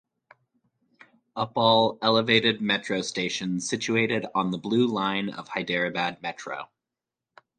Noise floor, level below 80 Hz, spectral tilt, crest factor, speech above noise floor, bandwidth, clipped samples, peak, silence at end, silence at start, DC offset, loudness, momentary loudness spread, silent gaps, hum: -88 dBFS; -66 dBFS; -4 dB/octave; 22 dB; 63 dB; 9.6 kHz; under 0.1%; -6 dBFS; 0.95 s; 1.35 s; under 0.1%; -25 LUFS; 14 LU; none; none